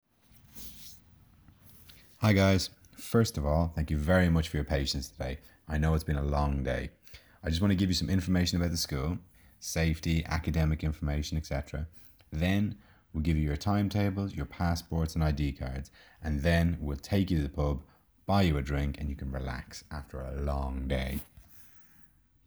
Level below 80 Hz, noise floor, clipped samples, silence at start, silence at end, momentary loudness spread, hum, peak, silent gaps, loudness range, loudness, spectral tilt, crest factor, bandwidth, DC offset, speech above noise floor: -40 dBFS; -60 dBFS; under 0.1%; 0.55 s; 0.65 s; 16 LU; none; -10 dBFS; none; 4 LU; -31 LUFS; -6 dB/octave; 20 dB; over 20 kHz; under 0.1%; 30 dB